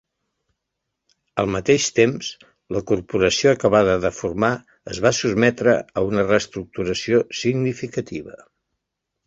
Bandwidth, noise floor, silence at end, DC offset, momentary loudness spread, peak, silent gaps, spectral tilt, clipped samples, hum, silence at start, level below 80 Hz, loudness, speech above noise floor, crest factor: 8 kHz; -80 dBFS; 0.9 s; under 0.1%; 13 LU; -2 dBFS; none; -4.5 dB/octave; under 0.1%; none; 1.35 s; -48 dBFS; -20 LUFS; 60 dB; 20 dB